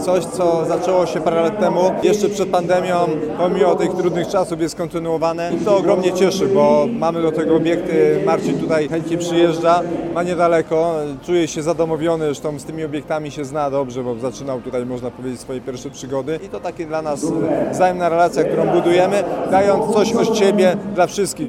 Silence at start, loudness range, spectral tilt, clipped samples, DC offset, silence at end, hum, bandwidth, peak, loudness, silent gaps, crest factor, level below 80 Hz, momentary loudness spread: 0 s; 8 LU; -5.5 dB/octave; under 0.1%; under 0.1%; 0 s; none; 15 kHz; 0 dBFS; -18 LUFS; none; 16 dB; -50 dBFS; 10 LU